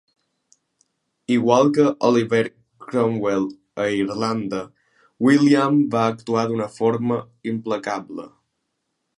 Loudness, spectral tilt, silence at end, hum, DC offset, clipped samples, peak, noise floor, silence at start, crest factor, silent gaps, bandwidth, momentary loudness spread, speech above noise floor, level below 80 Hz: -20 LUFS; -6.5 dB/octave; 0.9 s; none; under 0.1%; under 0.1%; -2 dBFS; -75 dBFS; 1.3 s; 20 dB; none; 11 kHz; 13 LU; 56 dB; -64 dBFS